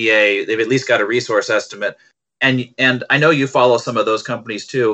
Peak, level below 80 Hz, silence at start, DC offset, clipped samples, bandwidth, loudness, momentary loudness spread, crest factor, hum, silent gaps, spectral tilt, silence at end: -2 dBFS; -66 dBFS; 0 s; under 0.1%; under 0.1%; 8.4 kHz; -16 LUFS; 11 LU; 16 dB; none; none; -4.5 dB/octave; 0 s